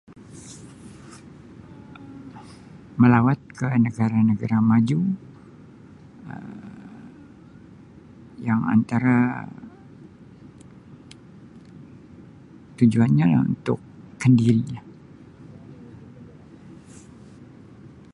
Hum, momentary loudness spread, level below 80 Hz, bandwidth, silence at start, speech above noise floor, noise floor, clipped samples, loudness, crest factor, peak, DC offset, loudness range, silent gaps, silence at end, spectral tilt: none; 27 LU; -56 dBFS; 10.5 kHz; 0.35 s; 27 dB; -46 dBFS; under 0.1%; -21 LUFS; 22 dB; -4 dBFS; under 0.1%; 11 LU; none; 0.25 s; -8.5 dB/octave